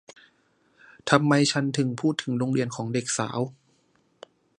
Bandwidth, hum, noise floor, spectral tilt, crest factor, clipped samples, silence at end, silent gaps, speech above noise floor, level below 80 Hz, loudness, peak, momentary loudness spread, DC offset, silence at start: 11.5 kHz; none; -66 dBFS; -5 dB/octave; 26 dB; under 0.1%; 1.05 s; none; 42 dB; -68 dBFS; -25 LUFS; -2 dBFS; 10 LU; under 0.1%; 1.05 s